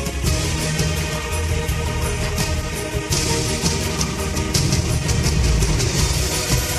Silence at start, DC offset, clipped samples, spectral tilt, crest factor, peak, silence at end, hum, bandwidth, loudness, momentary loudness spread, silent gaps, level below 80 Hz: 0 s; under 0.1%; under 0.1%; -4 dB/octave; 16 dB; -4 dBFS; 0 s; none; 13.5 kHz; -20 LUFS; 4 LU; none; -26 dBFS